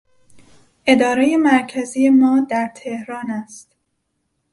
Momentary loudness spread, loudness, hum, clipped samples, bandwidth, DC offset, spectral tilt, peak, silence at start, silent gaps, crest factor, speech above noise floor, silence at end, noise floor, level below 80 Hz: 14 LU; -17 LUFS; none; under 0.1%; 11.5 kHz; under 0.1%; -4.5 dB/octave; 0 dBFS; 0.85 s; none; 18 dB; 55 dB; 0.95 s; -71 dBFS; -60 dBFS